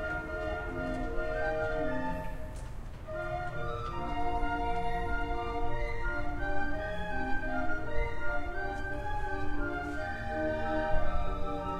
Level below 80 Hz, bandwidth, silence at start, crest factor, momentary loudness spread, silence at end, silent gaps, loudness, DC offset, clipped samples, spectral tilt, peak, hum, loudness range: -38 dBFS; 7.6 kHz; 0 s; 16 dB; 5 LU; 0 s; none; -35 LUFS; under 0.1%; under 0.1%; -7 dB/octave; -14 dBFS; none; 1 LU